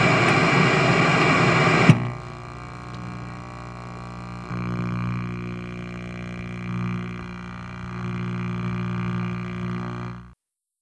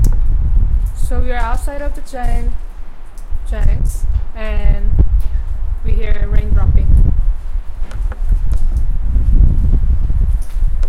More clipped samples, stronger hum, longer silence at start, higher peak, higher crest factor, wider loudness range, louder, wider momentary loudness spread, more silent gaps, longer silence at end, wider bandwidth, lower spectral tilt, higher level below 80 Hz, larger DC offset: second, under 0.1% vs 0.2%; first, 60 Hz at -35 dBFS vs none; about the same, 0 s vs 0 s; about the same, 0 dBFS vs 0 dBFS; first, 24 dB vs 12 dB; first, 12 LU vs 5 LU; second, -22 LUFS vs -19 LUFS; first, 19 LU vs 11 LU; neither; first, 0.5 s vs 0 s; about the same, 10.5 kHz vs 10 kHz; second, -6 dB/octave vs -7.5 dB/octave; second, -46 dBFS vs -14 dBFS; neither